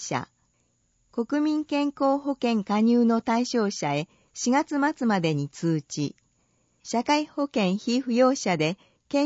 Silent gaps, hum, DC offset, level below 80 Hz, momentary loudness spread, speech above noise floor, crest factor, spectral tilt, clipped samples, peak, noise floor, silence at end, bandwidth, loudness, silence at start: none; none; under 0.1%; -70 dBFS; 10 LU; 45 dB; 18 dB; -5 dB/octave; under 0.1%; -8 dBFS; -69 dBFS; 0 s; 8 kHz; -25 LUFS; 0 s